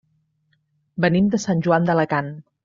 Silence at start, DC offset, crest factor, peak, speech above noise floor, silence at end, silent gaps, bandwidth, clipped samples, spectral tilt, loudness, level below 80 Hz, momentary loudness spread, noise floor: 0.95 s; under 0.1%; 18 dB; -4 dBFS; 48 dB; 0.25 s; none; 7.6 kHz; under 0.1%; -6.5 dB/octave; -20 LUFS; -54 dBFS; 10 LU; -67 dBFS